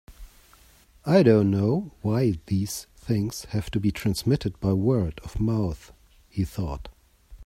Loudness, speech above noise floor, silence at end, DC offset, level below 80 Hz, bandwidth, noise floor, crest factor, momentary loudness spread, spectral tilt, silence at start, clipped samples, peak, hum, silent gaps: -25 LUFS; 32 dB; 0 s; under 0.1%; -44 dBFS; 16 kHz; -56 dBFS; 20 dB; 13 LU; -7 dB/octave; 0.1 s; under 0.1%; -6 dBFS; none; none